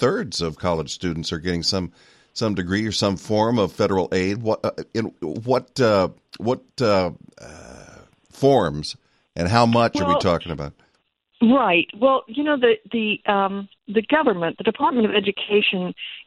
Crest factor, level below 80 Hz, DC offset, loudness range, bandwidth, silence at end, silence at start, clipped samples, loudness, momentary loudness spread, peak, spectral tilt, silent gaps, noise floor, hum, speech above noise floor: 20 dB; -50 dBFS; under 0.1%; 4 LU; 12 kHz; 0.05 s; 0 s; under 0.1%; -21 LUFS; 11 LU; -2 dBFS; -5.5 dB/octave; none; -67 dBFS; none; 46 dB